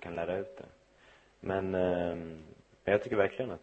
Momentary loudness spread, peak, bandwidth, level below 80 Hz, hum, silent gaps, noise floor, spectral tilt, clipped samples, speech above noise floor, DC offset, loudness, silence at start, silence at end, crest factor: 17 LU; -12 dBFS; 8.4 kHz; -62 dBFS; none; none; -62 dBFS; -7.5 dB/octave; under 0.1%; 29 dB; under 0.1%; -33 LUFS; 0 s; 0.05 s; 22 dB